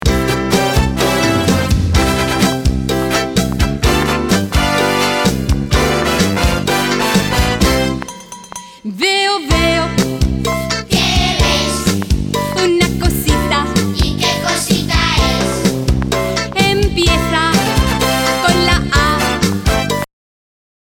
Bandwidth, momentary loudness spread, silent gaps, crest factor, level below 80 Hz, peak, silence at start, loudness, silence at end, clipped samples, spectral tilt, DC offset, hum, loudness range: 19 kHz; 4 LU; none; 14 dB; -22 dBFS; 0 dBFS; 0 s; -14 LUFS; 0.8 s; under 0.1%; -4.5 dB/octave; under 0.1%; none; 2 LU